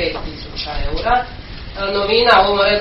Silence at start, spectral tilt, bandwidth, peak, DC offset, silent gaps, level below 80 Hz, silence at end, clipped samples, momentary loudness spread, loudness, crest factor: 0 s; -1 dB/octave; 6 kHz; 0 dBFS; under 0.1%; none; -30 dBFS; 0 s; under 0.1%; 18 LU; -16 LUFS; 16 dB